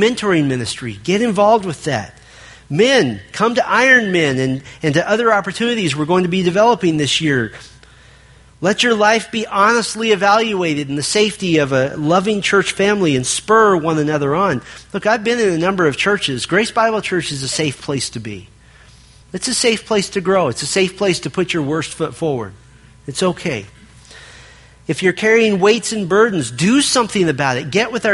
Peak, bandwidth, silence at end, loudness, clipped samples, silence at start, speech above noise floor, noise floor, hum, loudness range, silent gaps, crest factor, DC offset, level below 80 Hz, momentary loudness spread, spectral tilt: 0 dBFS; 11.5 kHz; 0 s; -16 LUFS; under 0.1%; 0 s; 29 dB; -45 dBFS; none; 5 LU; none; 16 dB; under 0.1%; -50 dBFS; 9 LU; -4 dB/octave